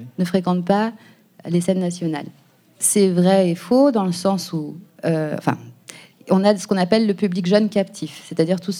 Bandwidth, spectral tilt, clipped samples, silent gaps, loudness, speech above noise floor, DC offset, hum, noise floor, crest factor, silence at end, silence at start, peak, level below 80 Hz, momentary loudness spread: 16 kHz; -5.5 dB/octave; under 0.1%; none; -19 LUFS; 25 dB; under 0.1%; none; -43 dBFS; 18 dB; 0 s; 0 s; -2 dBFS; -66 dBFS; 12 LU